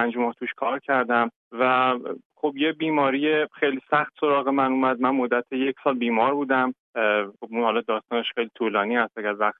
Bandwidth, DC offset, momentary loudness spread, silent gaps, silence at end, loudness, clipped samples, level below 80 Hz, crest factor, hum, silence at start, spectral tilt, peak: 4.2 kHz; under 0.1%; 6 LU; 1.36-1.51 s, 2.25-2.30 s, 6.79-6.93 s; 0.1 s; -24 LUFS; under 0.1%; -82 dBFS; 16 dB; none; 0 s; -8 dB/octave; -6 dBFS